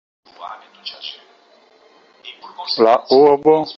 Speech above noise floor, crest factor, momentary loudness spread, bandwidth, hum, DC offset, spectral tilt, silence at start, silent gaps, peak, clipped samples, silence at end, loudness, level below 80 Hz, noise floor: 36 dB; 18 dB; 25 LU; 6.2 kHz; none; under 0.1%; -6.5 dB/octave; 0.4 s; none; -2 dBFS; under 0.1%; 0.05 s; -13 LUFS; -64 dBFS; -52 dBFS